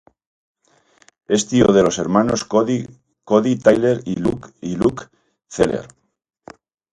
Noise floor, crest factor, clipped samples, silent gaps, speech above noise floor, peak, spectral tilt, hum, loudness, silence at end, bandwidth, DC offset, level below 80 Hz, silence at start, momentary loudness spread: -57 dBFS; 18 dB; under 0.1%; none; 40 dB; 0 dBFS; -5.5 dB/octave; none; -18 LUFS; 1.1 s; 11 kHz; under 0.1%; -48 dBFS; 1.3 s; 14 LU